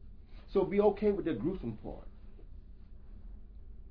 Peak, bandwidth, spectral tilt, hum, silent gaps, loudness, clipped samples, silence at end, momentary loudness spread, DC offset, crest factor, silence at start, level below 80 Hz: -16 dBFS; 5.2 kHz; -7.5 dB/octave; none; none; -32 LUFS; under 0.1%; 0 s; 27 LU; under 0.1%; 20 dB; 0 s; -50 dBFS